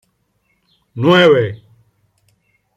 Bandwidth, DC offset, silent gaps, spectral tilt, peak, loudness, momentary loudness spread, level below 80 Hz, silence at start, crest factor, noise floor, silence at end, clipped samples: 12 kHz; under 0.1%; none; -6.5 dB/octave; 0 dBFS; -12 LUFS; 25 LU; -60 dBFS; 0.95 s; 16 dB; -64 dBFS; 1.2 s; under 0.1%